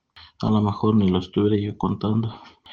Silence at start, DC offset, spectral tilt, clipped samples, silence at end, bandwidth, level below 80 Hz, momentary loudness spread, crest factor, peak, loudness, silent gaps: 0.15 s; under 0.1%; -9 dB/octave; under 0.1%; 0 s; 7 kHz; -52 dBFS; 6 LU; 16 dB; -8 dBFS; -22 LUFS; none